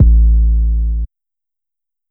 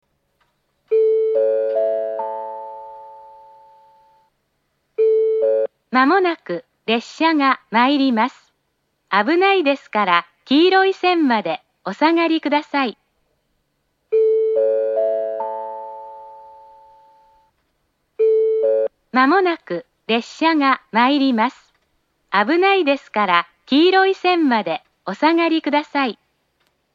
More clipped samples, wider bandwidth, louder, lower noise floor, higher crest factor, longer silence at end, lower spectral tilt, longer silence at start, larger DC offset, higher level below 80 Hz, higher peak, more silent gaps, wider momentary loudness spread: neither; second, 0.5 kHz vs 7.6 kHz; first, -15 LUFS vs -18 LUFS; first, -87 dBFS vs -70 dBFS; second, 12 dB vs 18 dB; first, 1.05 s vs 0.8 s; first, -14.5 dB/octave vs -5.5 dB/octave; second, 0 s vs 0.9 s; neither; first, -12 dBFS vs -74 dBFS; about the same, 0 dBFS vs 0 dBFS; neither; about the same, 13 LU vs 13 LU